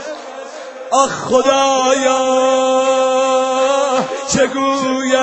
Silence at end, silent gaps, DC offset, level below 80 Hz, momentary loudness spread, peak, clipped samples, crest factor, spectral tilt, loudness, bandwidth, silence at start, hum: 0 s; none; under 0.1%; -54 dBFS; 15 LU; 0 dBFS; under 0.1%; 14 dB; -2.5 dB/octave; -14 LUFS; 8.6 kHz; 0 s; none